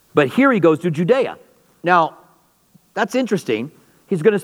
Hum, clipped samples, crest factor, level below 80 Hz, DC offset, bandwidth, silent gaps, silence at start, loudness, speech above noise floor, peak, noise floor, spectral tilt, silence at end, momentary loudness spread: none; under 0.1%; 18 dB; -70 dBFS; under 0.1%; 15.5 kHz; none; 0.15 s; -18 LUFS; 40 dB; 0 dBFS; -56 dBFS; -6.5 dB/octave; 0 s; 11 LU